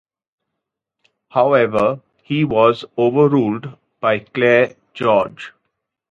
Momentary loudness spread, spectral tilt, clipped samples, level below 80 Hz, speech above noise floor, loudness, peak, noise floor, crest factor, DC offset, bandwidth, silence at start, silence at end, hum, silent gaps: 13 LU; -8 dB/octave; under 0.1%; -56 dBFS; 64 dB; -17 LUFS; 0 dBFS; -80 dBFS; 18 dB; under 0.1%; 7.8 kHz; 1.35 s; 0.6 s; none; none